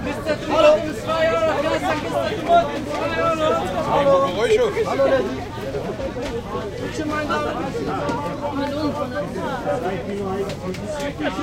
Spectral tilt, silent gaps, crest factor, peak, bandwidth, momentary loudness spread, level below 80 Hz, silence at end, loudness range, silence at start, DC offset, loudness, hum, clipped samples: -5.5 dB/octave; none; 20 dB; -2 dBFS; 16 kHz; 10 LU; -42 dBFS; 0 s; 6 LU; 0 s; under 0.1%; -21 LUFS; none; under 0.1%